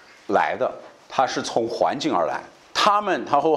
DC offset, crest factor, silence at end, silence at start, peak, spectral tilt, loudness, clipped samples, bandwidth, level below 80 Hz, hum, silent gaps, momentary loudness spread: under 0.1%; 18 dB; 0 s; 0.3 s; -4 dBFS; -3.5 dB/octave; -23 LUFS; under 0.1%; 13 kHz; -64 dBFS; none; none; 9 LU